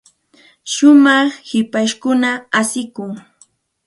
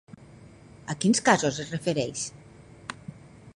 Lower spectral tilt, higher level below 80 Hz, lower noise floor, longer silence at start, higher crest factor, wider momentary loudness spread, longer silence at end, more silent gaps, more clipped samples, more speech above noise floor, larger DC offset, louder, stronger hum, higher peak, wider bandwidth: about the same, -3 dB/octave vs -4 dB/octave; second, -66 dBFS vs -60 dBFS; about the same, -53 dBFS vs -50 dBFS; first, 0.65 s vs 0.4 s; second, 16 dB vs 24 dB; second, 19 LU vs 22 LU; first, 0.65 s vs 0.05 s; neither; neither; first, 39 dB vs 25 dB; neither; first, -14 LUFS vs -26 LUFS; neither; first, 0 dBFS vs -4 dBFS; about the same, 11.5 kHz vs 11.5 kHz